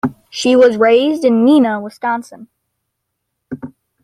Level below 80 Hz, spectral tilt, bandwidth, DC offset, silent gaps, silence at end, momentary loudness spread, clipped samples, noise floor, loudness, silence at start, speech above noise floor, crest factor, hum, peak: -58 dBFS; -5 dB/octave; 12 kHz; under 0.1%; none; 0.35 s; 20 LU; under 0.1%; -74 dBFS; -13 LUFS; 0.05 s; 62 dB; 14 dB; none; -2 dBFS